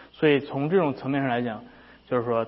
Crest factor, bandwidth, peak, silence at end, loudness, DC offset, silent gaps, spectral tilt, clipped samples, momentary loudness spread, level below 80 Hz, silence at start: 18 dB; 5.8 kHz; -8 dBFS; 0 s; -25 LUFS; under 0.1%; none; -11 dB/octave; under 0.1%; 8 LU; -64 dBFS; 0 s